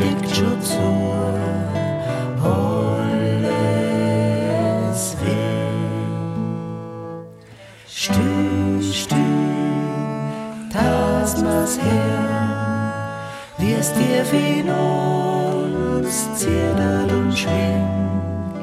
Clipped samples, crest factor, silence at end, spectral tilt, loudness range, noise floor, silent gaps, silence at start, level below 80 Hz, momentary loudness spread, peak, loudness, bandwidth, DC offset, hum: under 0.1%; 14 dB; 0 s; -5.5 dB/octave; 4 LU; -42 dBFS; none; 0 s; -44 dBFS; 8 LU; -6 dBFS; -20 LUFS; 15.5 kHz; under 0.1%; none